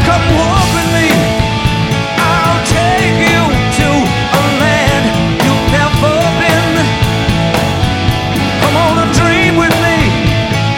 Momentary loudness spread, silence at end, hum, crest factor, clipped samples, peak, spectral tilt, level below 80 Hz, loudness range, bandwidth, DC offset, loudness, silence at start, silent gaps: 3 LU; 0 s; none; 10 dB; under 0.1%; 0 dBFS; -5 dB/octave; -24 dBFS; 1 LU; 19 kHz; under 0.1%; -11 LUFS; 0 s; none